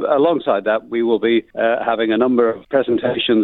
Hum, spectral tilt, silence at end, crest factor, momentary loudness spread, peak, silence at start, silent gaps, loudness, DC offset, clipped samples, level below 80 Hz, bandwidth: none; -8.5 dB/octave; 0 s; 14 dB; 3 LU; -2 dBFS; 0 s; none; -17 LUFS; under 0.1%; under 0.1%; -58 dBFS; 4.2 kHz